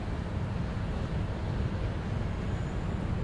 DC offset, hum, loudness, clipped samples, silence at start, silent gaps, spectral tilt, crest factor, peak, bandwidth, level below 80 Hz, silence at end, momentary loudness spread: under 0.1%; none; -34 LUFS; under 0.1%; 0 s; none; -7.5 dB/octave; 12 dB; -20 dBFS; 10.5 kHz; -38 dBFS; 0 s; 1 LU